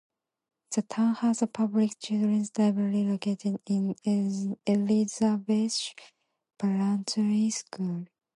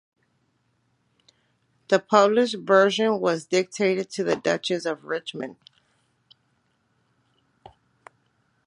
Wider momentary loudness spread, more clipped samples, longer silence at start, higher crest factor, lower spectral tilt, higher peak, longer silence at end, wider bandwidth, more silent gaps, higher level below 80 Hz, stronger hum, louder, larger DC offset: second, 7 LU vs 12 LU; neither; second, 0.7 s vs 1.9 s; second, 14 dB vs 24 dB; about the same, -5.5 dB/octave vs -4.5 dB/octave; second, -12 dBFS vs -2 dBFS; second, 0.35 s vs 3.15 s; about the same, 11.5 kHz vs 11 kHz; neither; about the same, -76 dBFS vs -74 dBFS; neither; second, -28 LUFS vs -23 LUFS; neither